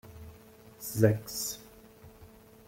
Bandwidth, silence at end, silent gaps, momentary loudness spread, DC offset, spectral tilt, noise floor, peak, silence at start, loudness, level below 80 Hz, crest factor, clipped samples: 16.5 kHz; 0.4 s; none; 26 LU; under 0.1%; -5.5 dB/octave; -54 dBFS; -10 dBFS; 0.05 s; -30 LUFS; -60 dBFS; 24 dB; under 0.1%